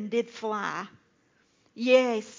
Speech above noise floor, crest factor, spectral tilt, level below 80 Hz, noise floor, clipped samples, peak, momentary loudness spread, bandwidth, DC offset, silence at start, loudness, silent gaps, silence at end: 40 dB; 20 dB; -4.5 dB/octave; -82 dBFS; -67 dBFS; under 0.1%; -8 dBFS; 14 LU; 7.6 kHz; under 0.1%; 0 s; -27 LUFS; none; 0 s